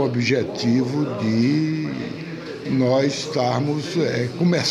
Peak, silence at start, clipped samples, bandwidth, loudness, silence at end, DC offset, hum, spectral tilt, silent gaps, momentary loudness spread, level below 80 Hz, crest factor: -6 dBFS; 0 s; under 0.1%; 12 kHz; -21 LUFS; 0 s; under 0.1%; none; -6 dB/octave; none; 10 LU; -60 dBFS; 14 dB